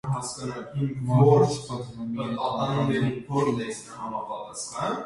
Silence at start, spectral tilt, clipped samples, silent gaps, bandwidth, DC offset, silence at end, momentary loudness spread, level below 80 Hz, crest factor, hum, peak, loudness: 0.05 s; -6.5 dB/octave; under 0.1%; none; 11.5 kHz; under 0.1%; 0 s; 15 LU; -58 dBFS; 20 dB; none; -6 dBFS; -26 LUFS